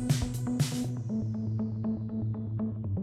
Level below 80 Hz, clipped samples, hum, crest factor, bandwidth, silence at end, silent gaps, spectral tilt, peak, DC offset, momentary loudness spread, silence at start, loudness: -48 dBFS; under 0.1%; none; 16 dB; 15 kHz; 0 s; none; -6.5 dB/octave; -14 dBFS; under 0.1%; 4 LU; 0 s; -32 LUFS